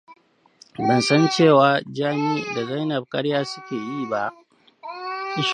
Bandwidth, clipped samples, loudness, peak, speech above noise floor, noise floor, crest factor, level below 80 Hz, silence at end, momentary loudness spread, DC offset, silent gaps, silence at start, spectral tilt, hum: 10.5 kHz; under 0.1%; -21 LUFS; -2 dBFS; 34 dB; -54 dBFS; 20 dB; -70 dBFS; 0 s; 15 LU; under 0.1%; none; 0.1 s; -5.5 dB/octave; none